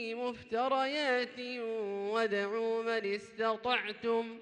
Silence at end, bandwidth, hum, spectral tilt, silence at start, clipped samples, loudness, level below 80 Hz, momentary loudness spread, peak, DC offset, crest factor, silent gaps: 0 s; 9.6 kHz; none; -4 dB/octave; 0 s; under 0.1%; -34 LUFS; -76 dBFS; 7 LU; -16 dBFS; under 0.1%; 18 dB; none